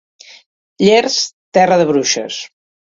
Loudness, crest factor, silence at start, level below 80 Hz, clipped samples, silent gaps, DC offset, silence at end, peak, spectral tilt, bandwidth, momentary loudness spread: -14 LUFS; 16 dB; 0.8 s; -58 dBFS; under 0.1%; 1.33-1.52 s; under 0.1%; 0.45 s; 0 dBFS; -3.5 dB/octave; 7.8 kHz; 14 LU